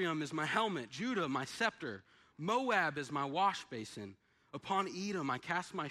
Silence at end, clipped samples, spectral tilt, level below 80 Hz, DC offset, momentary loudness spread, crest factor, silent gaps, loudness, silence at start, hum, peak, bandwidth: 0 s; under 0.1%; -4.5 dB/octave; -78 dBFS; under 0.1%; 14 LU; 18 dB; none; -37 LUFS; 0 s; none; -20 dBFS; 14 kHz